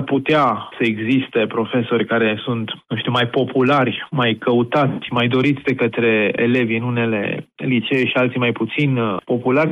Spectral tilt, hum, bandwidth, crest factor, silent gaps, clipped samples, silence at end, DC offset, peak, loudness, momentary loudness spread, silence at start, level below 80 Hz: -8 dB/octave; none; 7.6 kHz; 12 dB; none; under 0.1%; 0 s; under 0.1%; -6 dBFS; -18 LUFS; 5 LU; 0 s; -62 dBFS